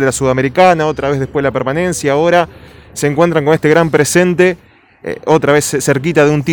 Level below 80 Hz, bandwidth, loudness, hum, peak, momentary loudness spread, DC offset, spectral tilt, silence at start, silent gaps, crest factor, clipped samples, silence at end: -42 dBFS; 19.5 kHz; -12 LUFS; none; 0 dBFS; 9 LU; under 0.1%; -5 dB/octave; 0 s; none; 12 dB; 0.1%; 0 s